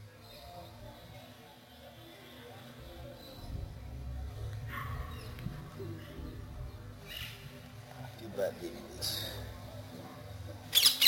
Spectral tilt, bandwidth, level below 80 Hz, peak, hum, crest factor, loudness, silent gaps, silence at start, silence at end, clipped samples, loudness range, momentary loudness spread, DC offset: -2.5 dB/octave; 16.5 kHz; -50 dBFS; -10 dBFS; none; 30 dB; -38 LUFS; none; 0 s; 0 s; under 0.1%; 8 LU; 15 LU; under 0.1%